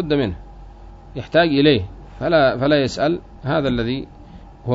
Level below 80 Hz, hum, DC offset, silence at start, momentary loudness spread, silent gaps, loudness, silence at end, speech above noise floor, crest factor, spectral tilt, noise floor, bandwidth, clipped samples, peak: -40 dBFS; none; under 0.1%; 0 s; 18 LU; none; -19 LUFS; 0 s; 22 dB; 18 dB; -6.5 dB/octave; -40 dBFS; 7.8 kHz; under 0.1%; -2 dBFS